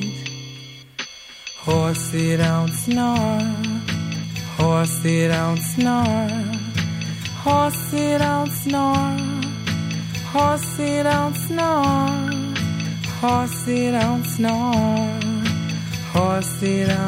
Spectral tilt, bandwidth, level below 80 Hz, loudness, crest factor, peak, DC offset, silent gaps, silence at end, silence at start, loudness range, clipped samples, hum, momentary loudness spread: -5.5 dB/octave; 16 kHz; -48 dBFS; -21 LUFS; 14 dB; -6 dBFS; under 0.1%; none; 0 s; 0 s; 1 LU; under 0.1%; none; 8 LU